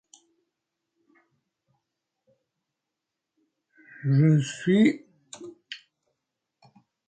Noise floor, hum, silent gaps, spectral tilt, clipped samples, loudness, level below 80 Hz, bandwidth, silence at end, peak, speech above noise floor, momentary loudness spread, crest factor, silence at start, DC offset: -85 dBFS; none; none; -7 dB/octave; under 0.1%; -23 LUFS; -72 dBFS; 9 kHz; 1.3 s; -10 dBFS; 64 dB; 23 LU; 18 dB; 4.05 s; under 0.1%